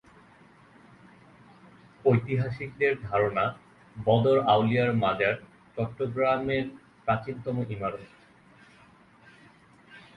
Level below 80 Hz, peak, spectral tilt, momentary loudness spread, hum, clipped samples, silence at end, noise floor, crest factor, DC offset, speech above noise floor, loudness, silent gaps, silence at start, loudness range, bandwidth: -58 dBFS; -8 dBFS; -8.5 dB/octave; 12 LU; none; under 0.1%; 0.2 s; -56 dBFS; 20 dB; under 0.1%; 30 dB; -27 LUFS; none; 2.05 s; 8 LU; 5.8 kHz